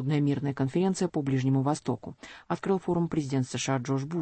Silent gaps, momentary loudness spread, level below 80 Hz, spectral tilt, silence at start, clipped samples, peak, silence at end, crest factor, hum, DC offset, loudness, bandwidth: none; 8 LU; -62 dBFS; -6.5 dB/octave; 0 s; under 0.1%; -14 dBFS; 0 s; 14 dB; none; under 0.1%; -29 LUFS; 8.8 kHz